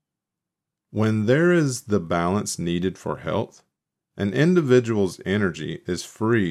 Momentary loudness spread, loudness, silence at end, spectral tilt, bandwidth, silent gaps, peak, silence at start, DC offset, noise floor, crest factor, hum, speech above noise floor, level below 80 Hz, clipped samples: 11 LU; -23 LUFS; 0 s; -6 dB/octave; 14 kHz; none; -6 dBFS; 0.95 s; under 0.1%; -86 dBFS; 18 dB; none; 64 dB; -58 dBFS; under 0.1%